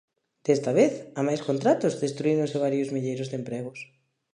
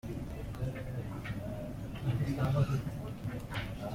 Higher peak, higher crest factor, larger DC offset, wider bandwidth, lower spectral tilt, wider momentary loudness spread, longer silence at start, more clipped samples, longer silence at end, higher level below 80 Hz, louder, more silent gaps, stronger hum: first, -8 dBFS vs -18 dBFS; about the same, 18 dB vs 16 dB; neither; second, 10.5 kHz vs 16.5 kHz; about the same, -6.5 dB/octave vs -7.5 dB/octave; about the same, 12 LU vs 10 LU; first, 0.45 s vs 0.05 s; neither; first, 0.5 s vs 0 s; second, -76 dBFS vs -48 dBFS; first, -26 LUFS vs -37 LUFS; neither; neither